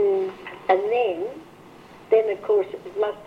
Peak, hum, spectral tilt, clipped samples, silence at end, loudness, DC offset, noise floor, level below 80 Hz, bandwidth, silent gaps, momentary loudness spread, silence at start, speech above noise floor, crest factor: -6 dBFS; none; -6 dB/octave; under 0.1%; 0 s; -24 LUFS; under 0.1%; -46 dBFS; -66 dBFS; 6.4 kHz; none; 11 LU; 0 s; 24 dB; 18 dB